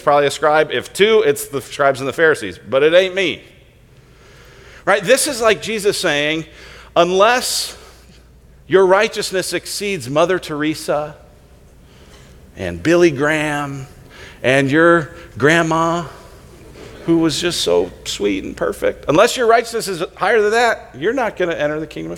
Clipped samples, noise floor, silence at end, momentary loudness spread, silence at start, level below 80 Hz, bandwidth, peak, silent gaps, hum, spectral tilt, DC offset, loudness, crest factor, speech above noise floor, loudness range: under 0.1%; -46 dBFS; 0 s; 11 LU; 0.05 s; -46 dBFS; 17.5 kHz; 0 dBFS; none; none; -4 dB/octave; under 0.1%; -16 LUFS; 18 dB; 31 dB; 4 LU